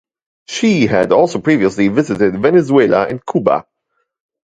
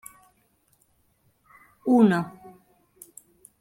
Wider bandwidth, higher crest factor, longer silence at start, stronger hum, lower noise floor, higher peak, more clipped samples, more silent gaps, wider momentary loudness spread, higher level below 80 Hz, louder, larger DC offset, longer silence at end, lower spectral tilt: second, 9.2 kHz vs 15.5 kHz; second, 14 dB vs 22 dB; second, 0.5 s vs 1.85 s; neither; about the same, -69 dBFS vs -67 dBFS; first, 0 dBFS vs -6 dBFS; neither; neither; second, 6 LU vs 28 LU; first, -50 dBFS vs -70 dBFS; first, -14 LUFS vs -22 LUFS; neither; second, 1 s vs 1.3 s; about the same, -6 dB/octave vs -7 dB/octave